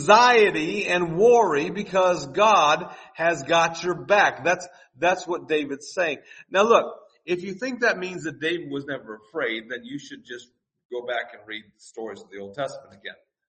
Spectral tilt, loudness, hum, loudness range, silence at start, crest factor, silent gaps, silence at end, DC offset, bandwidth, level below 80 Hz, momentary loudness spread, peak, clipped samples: -3.5 dB/octave; -22 LUFS; none; 13 LU; 0 s; 22 dB; 10.85-10.90 s; 0.35 s; under 0.1%; 8.4 kHz; -64 dBFS; 20 LU; -2 dBFS; under 0.1%